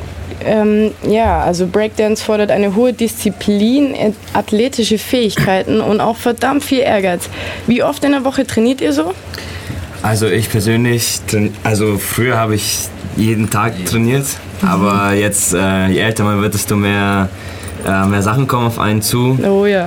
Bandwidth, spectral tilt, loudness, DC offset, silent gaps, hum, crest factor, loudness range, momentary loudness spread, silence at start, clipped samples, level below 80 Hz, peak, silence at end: 18 kHz; -5 dB/octave; -14 LUFS; under 0.1%; none; none; 12 dB; 2 LU; 6 LU; 0 s; under 0.1%; -38 dBFS; -2 dBFS; 0 s